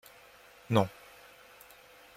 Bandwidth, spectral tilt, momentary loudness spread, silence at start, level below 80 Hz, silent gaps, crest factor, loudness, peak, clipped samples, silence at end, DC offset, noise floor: 16.5 kHz; -6.5 dB/octave; 25 LU; 0.7 s; -70 dBFS; none; 28 dB; -31 LUFS; -10 dBFS; under 0.1%; 1.3 s; under 0.1%; -57 dBFS